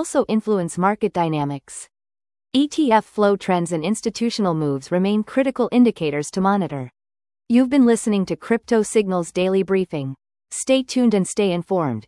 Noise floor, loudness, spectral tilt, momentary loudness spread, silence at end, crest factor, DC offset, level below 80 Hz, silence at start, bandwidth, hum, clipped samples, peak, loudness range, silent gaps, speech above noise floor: under -90 dBFS; -20 LUFS; -5.5 dB/octave; 10 LU; 0.05 s; 16 dB; under 0.1%; -58 dBFS; 0 s; 12 kHz; none; under 0.1%; -4 dBFS; 2 LU; none; over 71 dB